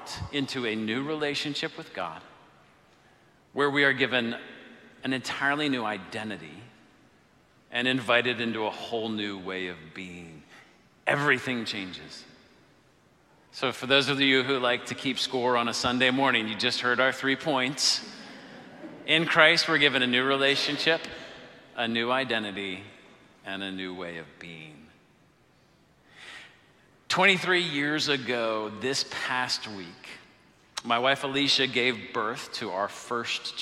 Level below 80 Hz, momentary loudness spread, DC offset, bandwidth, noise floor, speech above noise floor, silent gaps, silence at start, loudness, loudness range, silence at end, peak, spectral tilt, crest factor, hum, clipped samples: -66 dBFS; 21 LU; under 0.1%; 14.5 kHz; -62 dBFS; 34 dB; none; 0 s; -26 LUFS; 9 LU; 0 s; -4 dBFS; -3 dB/octave; 24 dB; none; under 0.1%